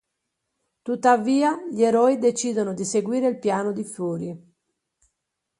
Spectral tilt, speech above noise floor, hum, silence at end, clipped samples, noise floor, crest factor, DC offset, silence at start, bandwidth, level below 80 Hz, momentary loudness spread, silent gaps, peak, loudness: -5 dB/octave; 58 dB; none; 1.2 s; under 0.1%; -80 dBFS; 20 dB; under 0.1%; 0.85 s; 11.5 kHz; -72 dBFS; 12 LU; none; -4 dBFS; -22 LUFS